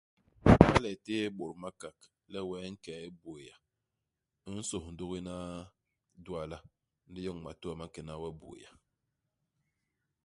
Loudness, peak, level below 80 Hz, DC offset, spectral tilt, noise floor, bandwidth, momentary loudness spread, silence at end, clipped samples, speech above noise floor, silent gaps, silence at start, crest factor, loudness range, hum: -32 LUFS; 0 dBFS; -48 dBFS; under 0.1%; -6.5 dB/octave; -87 dBFS; 11.5 kHz; 25 LU; 1.6 s; under 0.1%; 46 dB; none; 0.45 s; 34 dB; 16 LU; none